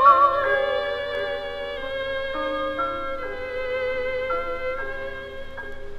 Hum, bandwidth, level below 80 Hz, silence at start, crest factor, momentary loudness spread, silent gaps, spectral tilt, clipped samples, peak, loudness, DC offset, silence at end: none; 9.6 kHz; -42 dBFS; 0 s; 20 dB; 12 LU; none; -5 dB/octave; under 0.1%; -4 dBFS; -25 LUFS; under 0.1%; 0 s